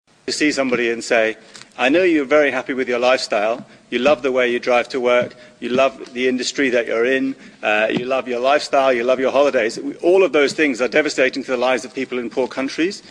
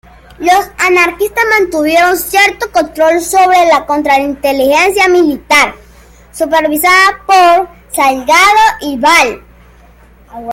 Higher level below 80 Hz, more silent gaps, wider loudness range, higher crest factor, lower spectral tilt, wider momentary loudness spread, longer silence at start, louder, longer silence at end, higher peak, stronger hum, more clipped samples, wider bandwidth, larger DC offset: second, -60 dBFS vs -40 dBFS; neither; about the same, 2 LU vs 2 LU; about the same, 14 dB vs 10 dB; first, -3.5 dB/octave vs -2 dB/octave; about the same, 7 LU vs 7 LU; second, 0.25 s vs 0.4 s; second, -18 LUFS vs -9 LUFS; about the same, 0 s vs 0 s; second, -4 dBFS vs 0 dBFS; neither; neither; second, 10.5 kHz vs 17 kHz; neither